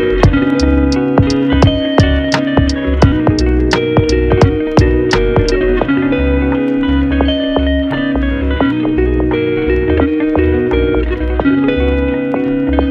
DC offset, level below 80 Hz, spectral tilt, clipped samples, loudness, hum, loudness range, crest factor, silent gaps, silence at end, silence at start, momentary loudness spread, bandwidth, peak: under 0.1%; -18 dBFS; -7 dB/octave; under 0.1%; -13 LUFS; none; 2 LU; 12 dB; none; 0 s; 0 s; 4 LU; 9.2 kHz; 0 dBFS